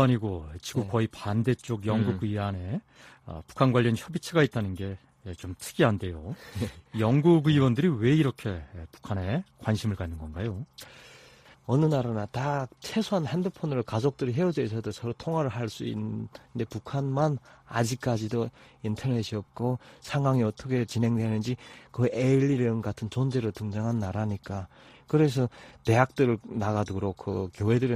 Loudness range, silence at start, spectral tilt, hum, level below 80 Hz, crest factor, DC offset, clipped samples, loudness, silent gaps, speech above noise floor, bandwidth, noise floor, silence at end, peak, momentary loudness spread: 5 LU; 0 s; -7 dB/octave; none; -54 dBFS; 22 dB; under 0.1%; under 0.1%; -28 LUFS; none; 27 dB; 14.5 kHz; -54 dBFS; 0 s; -6 dBFS; 13 LU